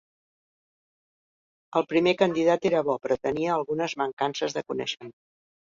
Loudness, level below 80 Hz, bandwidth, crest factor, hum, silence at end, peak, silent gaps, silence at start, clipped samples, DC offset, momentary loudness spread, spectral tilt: -26 LUFS; -66 dBFS; 7.6 kHz; 22 dB; none; 0.65 s; -6 dBFS; 4.13-4.17 s; 1.7 s; under 0.1%; under 0.1%; 8 LU; -5 dB/octave